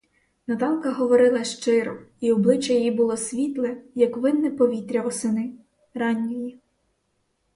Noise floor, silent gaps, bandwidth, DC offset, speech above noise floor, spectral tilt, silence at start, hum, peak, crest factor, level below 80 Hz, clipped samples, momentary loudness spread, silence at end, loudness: -72 dBFS; none; 11.5 kHz; under 0.1%; 50 dB; -5 dB/octave; 0.5 s; none; -6 dBFS; 18 dB; -68 dBFS; under 0.1%; 11 LU; 1.05 s; -23 LUFS